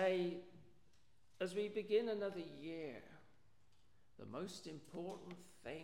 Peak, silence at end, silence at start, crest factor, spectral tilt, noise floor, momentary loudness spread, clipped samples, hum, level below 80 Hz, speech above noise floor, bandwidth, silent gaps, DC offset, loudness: -26 dBFS; 0 s; 0 s; 20 dB; -5.5 dB/octave; -76 dBFS; 18 LU; under 0.1%; none; -80 dBFS; 31 dB; 15.5 kHz; none; under 0.1%; -45 LUFS